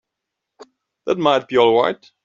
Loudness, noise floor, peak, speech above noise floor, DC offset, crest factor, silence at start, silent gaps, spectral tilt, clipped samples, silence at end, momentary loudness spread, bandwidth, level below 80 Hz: -17 LUFS; -81 dBFS; -2 dBFS; 64 dB; under 0.1%; 16 dB; 1.05 s; none; -5.5 dB/octave; under 0.1%; 0.3 s; 9 LU; 7.4 kHz; -64 dBFS